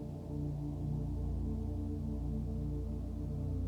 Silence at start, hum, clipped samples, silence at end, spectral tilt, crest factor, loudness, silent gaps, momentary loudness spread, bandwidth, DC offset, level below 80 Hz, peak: 0 s; none; under 0.1%; 0 s; -10 dB/octave; 10 dB; -39 LUFS; none; 2 LU; 8.2 kHz; under 0.1%; -42 dBFS; -26 dBFS